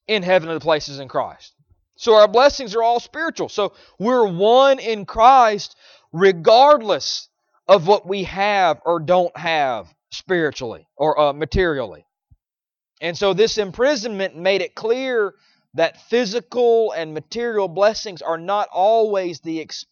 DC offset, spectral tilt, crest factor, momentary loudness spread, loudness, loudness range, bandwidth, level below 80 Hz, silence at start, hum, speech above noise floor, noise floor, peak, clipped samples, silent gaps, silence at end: under 0.1%; -4.5 dB/octave; 18 dB; 14 LU; -18 LUFS; 6 LU; 7.2 kHz; -46 dBFS; 0.1 s; none; over 72 dB; under -90 dBFS; 0 dBFS; under 0.1%; none; 0.1 s